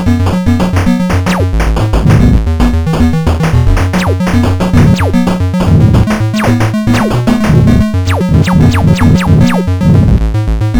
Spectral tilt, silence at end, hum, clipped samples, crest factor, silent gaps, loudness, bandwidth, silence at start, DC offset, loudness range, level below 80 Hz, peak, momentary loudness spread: -7 dB/octave; 0 s; none; under 0.1%; 8 dB; none; -9 LUFS; 18.5 kHz; 0 s; under 0.1%; 2 LU; -16 dBFS; 0 dBFS; 4 LU